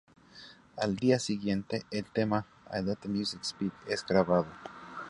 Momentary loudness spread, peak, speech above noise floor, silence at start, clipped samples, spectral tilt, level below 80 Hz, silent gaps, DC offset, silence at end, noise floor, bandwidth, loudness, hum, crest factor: 18 LU; -10 dBFS; 23 dB; 0.35 s; under 0.1%; -5.5 dB/octave; -62 dBFS; none; under 0.1%; 0 s; -54 dBFS; 11.5 kHz; -32 LUFS; none; 22 dB